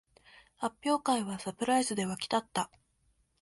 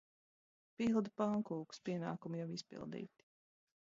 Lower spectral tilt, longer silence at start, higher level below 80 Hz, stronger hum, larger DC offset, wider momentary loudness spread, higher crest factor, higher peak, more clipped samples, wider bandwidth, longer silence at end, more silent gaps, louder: second, -4 dB/octave vs -6.5 dB/octave; second, 0.6 s vs 0.8 s; first, -70 dBFS vs -78 dBFS; neither; neither; second, 9 LU vs 12 LU; about the same, 18 dB vs 20 dB; first, -16 dBFS vs -24 dBFS; neither; first, 11.5 kHz vs 7.6 kHz; second, 0.75 s vs 0.9 s; neither; first, -32 LUFS vs -41 LUFS